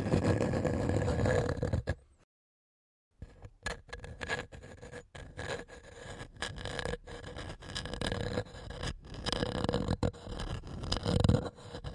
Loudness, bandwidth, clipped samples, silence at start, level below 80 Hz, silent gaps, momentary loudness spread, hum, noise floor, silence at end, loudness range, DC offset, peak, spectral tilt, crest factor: -35 LUFS; 11.5 kHz; under 0.1%; 0 s; -46 dBFS; 2.24-3.11 s; 18 LU; none; under -90 dBFS; 0 s; 9 LU; under 0.1%; -12 dBFS; -6 dB/octave; 24 dB